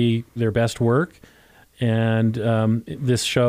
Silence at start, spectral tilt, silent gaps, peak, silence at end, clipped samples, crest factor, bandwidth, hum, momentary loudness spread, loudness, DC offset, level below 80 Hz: 0 s; -6 dB/octave; none; -6 dBFS; 0 s; under 0.1%; 16 dB; 15.5 kHz; none; 4 LU; -22 LUFS; under 0.1%; -52 dBFS